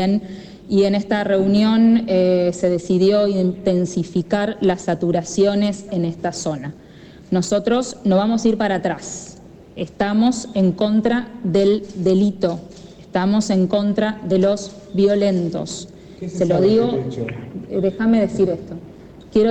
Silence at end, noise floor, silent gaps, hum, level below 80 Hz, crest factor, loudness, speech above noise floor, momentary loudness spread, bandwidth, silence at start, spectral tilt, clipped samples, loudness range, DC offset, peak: 0 s; -40 dBFS; none; none; -50 dBFS; 12 dB; -19 LUFS; 22 dB; 13 LU; 9 kHz; 0 s; -6.5 dB/octave; under 0.1%; 4 LU; under 0.1%; -6 dBFS